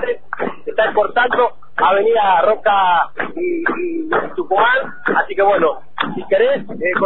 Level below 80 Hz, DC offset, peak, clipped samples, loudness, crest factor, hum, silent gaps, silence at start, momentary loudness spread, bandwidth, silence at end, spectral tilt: -52 dBFS; 4%; -2 dBFS; under 0.1%; -16 LUFS; 14 dB; none; none; 0 s; 9 LU; 4.2 kHz; 0 s; -8.5 dB/octave